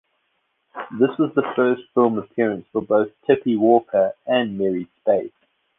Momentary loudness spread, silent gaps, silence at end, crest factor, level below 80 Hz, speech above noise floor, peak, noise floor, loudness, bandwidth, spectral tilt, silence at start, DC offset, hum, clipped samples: 8 LU; none; 0.5 s; 18 dB; -64 dBFS; 51 dB; -2 dBFS; -70 dBFS; -20 LUFS; 3.9 kHz; -9.5 dB/octave; 0.75 s; under 0.1%; none; under 0.1%